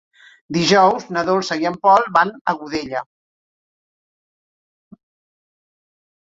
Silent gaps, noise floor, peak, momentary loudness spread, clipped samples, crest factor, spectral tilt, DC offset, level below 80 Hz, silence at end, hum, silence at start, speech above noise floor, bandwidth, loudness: 2.41-2.45 s; under -90 dBFS; -2 dBFS; 12 LU; under 0.1%; 20 dB; -4.5 dB/octave; under 0.1%; -60 dBFS; 3.3 s; none; 0.5 s; over 73 dB; 7.8 kHz; -17 LUFS